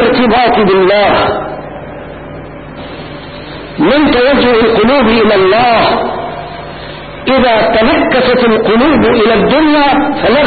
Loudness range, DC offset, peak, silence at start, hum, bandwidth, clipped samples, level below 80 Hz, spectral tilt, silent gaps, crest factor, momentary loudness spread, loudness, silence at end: 6 LU; under 0.1%; 0 dBFS; 0 s; none; 4.8 kHz; under 0.1%; -32 dBFS; -11.5 dB/octave; none; 8 dB; 18 LU; -8 LUFS; 0 s